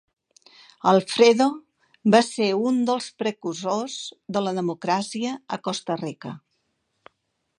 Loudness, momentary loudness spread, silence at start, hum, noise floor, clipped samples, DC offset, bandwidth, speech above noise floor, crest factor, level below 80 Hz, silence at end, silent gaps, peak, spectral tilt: -23 LUFS; 15 LU; 0.85 s; none; -75 dBFS; under 0.1%; under 0.1%; 11 kHz; 52 dB; 22 dB; -74 dBFS; 1.2 s; none; -2 dBFS; -5 dB/octave